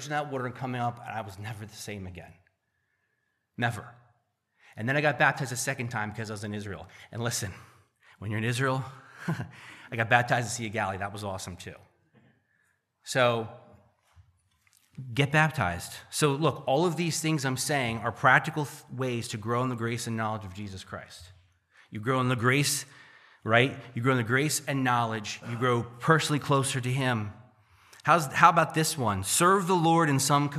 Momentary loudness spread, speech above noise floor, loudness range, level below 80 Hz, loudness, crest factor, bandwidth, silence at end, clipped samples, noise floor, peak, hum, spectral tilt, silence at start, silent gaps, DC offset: 17 LU; 49 dB; 8 LU; -66 dBFS; -27 LUFS; 26 dB; 15 kHz; 0 s; under 0.1%; -77 dBFS; -4 dBFS; none; -4.5 dB/octave; 0 s; none; under 0.1%